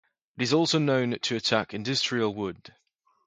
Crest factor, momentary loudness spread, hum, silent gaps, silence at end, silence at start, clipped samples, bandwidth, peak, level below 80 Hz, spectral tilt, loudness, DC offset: 22 dB; 10 LU; none; none; 0.6 s; 0.35 s; under 0.1%; 9.6 kHz; -6 dBFS; -66 dBFS; -4.5 dB/octave; -26 LUFS; under 0.1%